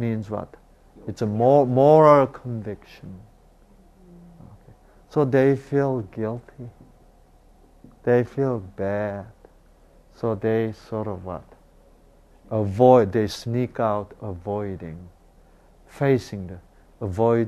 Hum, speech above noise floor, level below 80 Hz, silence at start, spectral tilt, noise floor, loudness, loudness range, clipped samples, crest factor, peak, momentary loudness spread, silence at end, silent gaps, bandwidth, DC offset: none; 32 dB; -54 dBFS; 0 s; -8 dB/octave; -53 dBFS; -22 LUFS; 9 LU; under 0.1%; 22 dB; -2 dBFS; 23 LU; 0 s; none; 13 kHz; under 0.1%